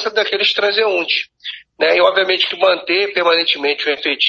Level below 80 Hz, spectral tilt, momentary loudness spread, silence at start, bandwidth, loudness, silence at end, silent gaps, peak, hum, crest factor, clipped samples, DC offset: -66 dBFS; -2.5 dB/octave; 6 LU; 0 s; 7.4 kHz; -15 LUFS; 0 s; none; 0 dBFS; none; 16 dB; under 0.1%; under 0.1%